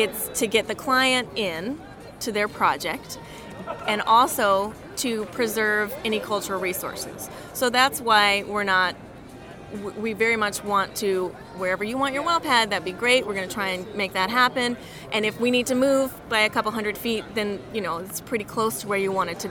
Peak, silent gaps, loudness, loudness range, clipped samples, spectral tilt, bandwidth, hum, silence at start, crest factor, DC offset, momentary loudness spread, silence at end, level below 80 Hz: -4 dBFS; none; -23 LUFS; 3 LU; under 0.1%; -3 dB/octave; 19.5 kHz; none; 0 s; 20 dB; under 0.1%; 14 LU; 0 s; -54 dBFS